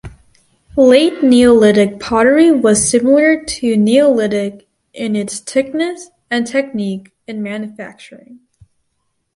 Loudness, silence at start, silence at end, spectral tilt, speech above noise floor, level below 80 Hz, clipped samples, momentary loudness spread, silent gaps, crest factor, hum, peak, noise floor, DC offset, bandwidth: -13 LUFS; 0.05 s; 1 s; -4.5 dB/octave; 55 dB; -46 dBFS; under 0.1%; 16 LU; none; 14 dB; none; 0 dBFS; -68 dBFS; under 0.1%; 11.5 kHz